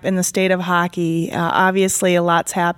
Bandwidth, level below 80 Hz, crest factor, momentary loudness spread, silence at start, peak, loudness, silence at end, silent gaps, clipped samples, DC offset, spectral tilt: 17 kHz; -56 dBFS; 14 dB; 5 LU; 0.05 s; -2 dBFS; -17 LUFS; 0.05 s; none; under 0.1%; under 0.1%; -4.5 dB/octave